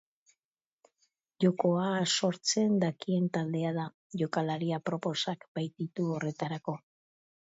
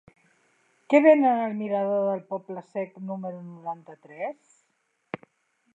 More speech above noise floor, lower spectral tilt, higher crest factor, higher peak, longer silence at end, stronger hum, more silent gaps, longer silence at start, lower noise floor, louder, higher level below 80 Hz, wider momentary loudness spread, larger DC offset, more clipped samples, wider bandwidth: first, over 59 dB vs 48 dB; second, -5 dB/octave vs -8 dB/octave; about the same, 18 dB vs 22 dB; second, -14 dBFS vs -4 dBFS; first, 0.75 s vs 0.6 s; neither; first, 3.94-4.10 s, 5.48-5.55 s vs none; first, 1.4 s vs 0.9 s; first, under -90 dBFS vs -73 dBFS; second, -31 LUFS vs -25 LUFS; about the same, -78 dBFS vs -82 dBFS; second, 9 LU vs 22 LU; neither; neither; about the same, 8 kHz vs 7.8 kHz